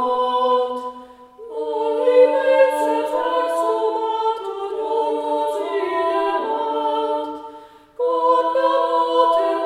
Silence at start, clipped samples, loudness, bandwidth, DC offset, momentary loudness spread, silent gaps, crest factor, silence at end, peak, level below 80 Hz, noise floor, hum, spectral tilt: 0 s; under 0.1%; -19 LUFS; 13 kHz; under 0.1%; 10 LU; none; 16 dB; 0 s; -2 dBFS; -66 dBFS; -42 dBFS; none; -3 dB/octave